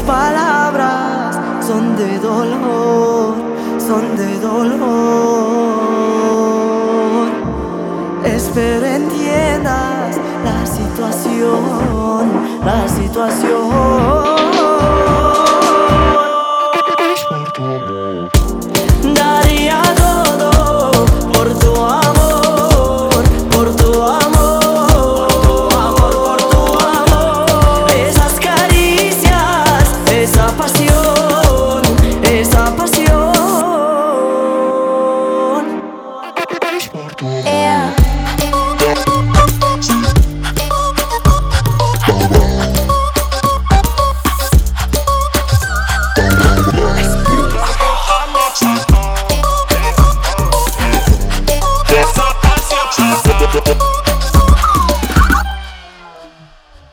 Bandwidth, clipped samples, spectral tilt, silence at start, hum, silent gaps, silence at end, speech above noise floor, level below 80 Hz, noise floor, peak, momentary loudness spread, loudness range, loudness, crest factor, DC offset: 18.5 kHz; under 0.1%; -5 dB/octave; 0 s; none; none; 0.65 s; 27 dB; -18 dBFS; -41 dBFS; 0 dBFS; 7 LU; 5 LU; -12 LUFS; 12 dB; under 0.1%